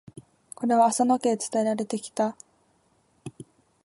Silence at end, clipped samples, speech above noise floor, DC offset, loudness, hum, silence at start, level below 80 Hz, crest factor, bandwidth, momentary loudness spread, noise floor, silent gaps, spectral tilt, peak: 0.55 s; under 0.1%; 42 dB; under 0.1%; -25 LUFS; none; 0.15 s; -74 dBFS; 18 dB; 12 kHz; 23 LU; -66 dBFS; none; -4.5 dB/octave; -10 dBFS